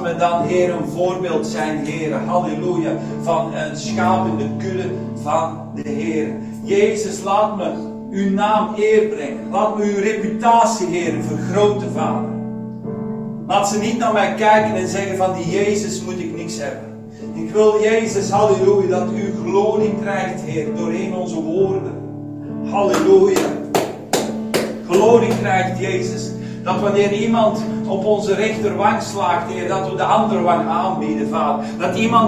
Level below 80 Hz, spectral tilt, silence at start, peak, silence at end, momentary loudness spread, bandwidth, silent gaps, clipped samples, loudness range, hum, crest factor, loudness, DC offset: -54 dBFS; -5.5 dB/octave; 0 s; 0 dBFS; 0 s; 11 LU; 16 kHz; none; under 0.1%; 4 LU; none; 18 dB; -18 LUFS; 0.2%